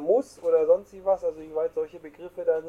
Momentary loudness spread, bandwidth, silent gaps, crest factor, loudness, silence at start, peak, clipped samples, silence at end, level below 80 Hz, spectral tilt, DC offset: 14 LU; 10 kHz; none; 16 dB; -26 LUFS; 0 s; -10 dBFS; under 0.1%; 0 s; -62 dBFS; -6.5 dB/octave; under 0.1%